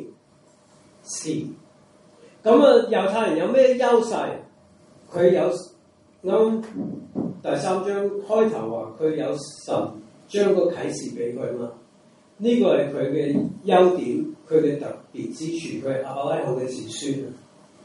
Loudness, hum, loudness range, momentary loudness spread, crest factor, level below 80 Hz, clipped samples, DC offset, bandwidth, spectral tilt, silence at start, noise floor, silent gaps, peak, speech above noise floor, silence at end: -22 LUFS; none; 6 LU; 15 LU; 20 dB; -70 dBFS; under 0.1%; under 0.1%; 11.5 kHz; -5.5 dB/octave; 0 s; -56 dBFS; none; -2 dBFS; 34 dB; 0.45 s